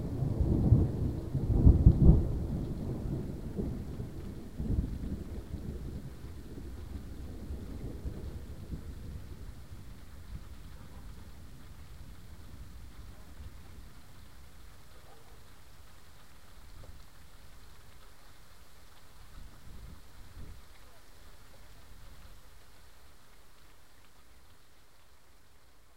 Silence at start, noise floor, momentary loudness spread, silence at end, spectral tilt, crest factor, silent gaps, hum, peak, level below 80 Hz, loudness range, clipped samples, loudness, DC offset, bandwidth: 0 s; -62 dBFS; 29 LU; 0.05 s; -9 dB/octave; 28 dB; none; none; -6 dBFS; -38 dBFS; 27 LU; under 0.1%; -33 LUFS; 0.4%; 15.5 kHz